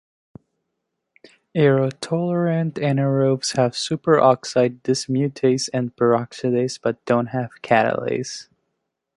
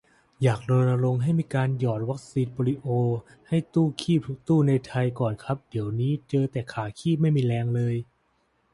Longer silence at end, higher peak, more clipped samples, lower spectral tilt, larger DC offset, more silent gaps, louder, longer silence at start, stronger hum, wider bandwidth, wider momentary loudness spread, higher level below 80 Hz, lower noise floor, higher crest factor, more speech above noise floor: about the same, 0.75 s vs 0.7 s; first, -2 dBFS vs -10 dBFS; neither; second, -5.5 dB/octave vs -8 dB/octave; neither; neither; first, -20 LUFS vs -26 LUFS; first, 1.55 s vs 0.4 s; neither; about the same, 11.5 kHz vs 11.5 kHz; about the same, 8 LU vs 7 LU; about the same, -62 dBFS vs -58 dBFS; first, -78 dBFS vs -69 dBFS; about the same, 20 dB vs 16 dB; first, 58 dB vs 44 dB